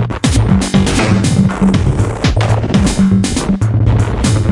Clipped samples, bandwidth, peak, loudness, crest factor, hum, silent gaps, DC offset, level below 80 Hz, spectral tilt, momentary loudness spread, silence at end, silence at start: under 0.1%; 11.5 kHz; 0 dBFS; -12 LUFS; 12 dB; none; none; under 0.1%; -22 dBFS; -6 dB/octave; 3 LU; 0 s; 0 s